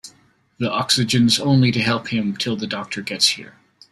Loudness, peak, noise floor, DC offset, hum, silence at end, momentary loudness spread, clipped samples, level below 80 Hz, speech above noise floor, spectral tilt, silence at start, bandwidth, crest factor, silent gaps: -19 LUFS; -2 dBFS; -57 dBFS; under 0.1%; none; 0.4 s; 11 LU; under 0.1%; -56 dBFS; 37 dB; -4 dB/octave; 0.05 s; 14.5 kHz; 18 dB; none